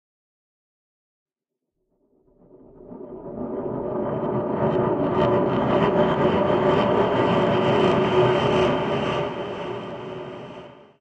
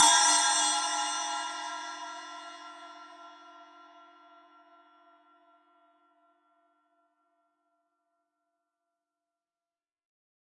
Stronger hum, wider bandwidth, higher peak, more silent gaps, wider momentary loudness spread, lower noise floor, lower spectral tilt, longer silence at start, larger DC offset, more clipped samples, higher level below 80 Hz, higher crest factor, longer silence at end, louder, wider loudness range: neither; second, 8.4 kHz vs 11.5 kHz; first, -6 dBFS vs -10 dBFS; neither; second, 16 LU vs 27 LU; second, -84 dBFS vs under -90 dBFS; first, -7.5 dB/octave vs 4 dB/octave; first, 2.8 s vs 0 s; neither; neither; first, -50 dBFS vs under -90 dBFS; second, 18 dB vs 24 dB; second, 0.25 s vs 6.75 s; first, -22 LUFS vs -26 LUFS; second, 13 LU vs 27 LU